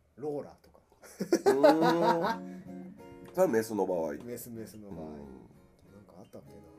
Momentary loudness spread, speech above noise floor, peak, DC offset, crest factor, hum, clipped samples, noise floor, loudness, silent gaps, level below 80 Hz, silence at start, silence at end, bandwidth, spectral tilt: 26 LU; 28 dB; -10 dBFS; under 0.1%; 22 dB; none; under 0.1%; -58 dBFS; -29 LUFS; none; -66 dBFS; 0.2 s; 0.2 s; 15.5 kHz; -5.5 dB/octave